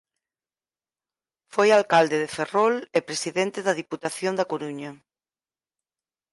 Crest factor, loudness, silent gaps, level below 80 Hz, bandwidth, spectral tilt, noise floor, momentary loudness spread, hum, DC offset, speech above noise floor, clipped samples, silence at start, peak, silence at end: 18 dB; -23 LUFS; none; -74 dBFS; 11.5 kHz; -4 dB/octave; under -90 dBFS; 12 LU; none; under 0.1%; over 67 dB; under 0.1%; 1.55 s; -6 dBFS; 1.4 s